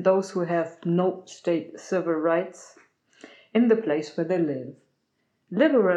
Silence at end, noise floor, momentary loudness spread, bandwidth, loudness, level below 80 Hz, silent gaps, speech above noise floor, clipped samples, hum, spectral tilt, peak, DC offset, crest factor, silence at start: 0 s; -74 dBFS; 10 LU; 10 kHz; -25 LUFS; under -90 dBFS; none; 50 dB; under 0.1%; none; -7 dB/octave; -8 dBFS; under 0.1%; 16 dB; 0 s